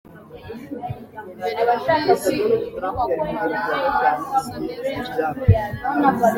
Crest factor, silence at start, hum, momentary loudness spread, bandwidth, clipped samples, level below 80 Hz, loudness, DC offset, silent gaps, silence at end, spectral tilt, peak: 20 dB; 0.05 s; none; 14 LU; 16.5 kHz; under 0.1%; -42 dBFS; -21 LUFS; under 0.1%; none; 0 s; -6.5 dB/octave; -2 dBFS